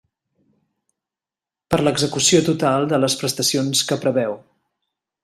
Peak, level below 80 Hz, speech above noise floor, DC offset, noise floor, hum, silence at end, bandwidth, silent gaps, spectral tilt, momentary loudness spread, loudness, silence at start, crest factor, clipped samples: -2 dBFS; -56 dBFS; 71 dB; under 0.1%; -89 dBFS; none; 0.85 s; 15.5 kHz; none; -3.5 dB/octave; 8 LU; -18 LUFS; 1.7 s; 18 dB; under 0.1%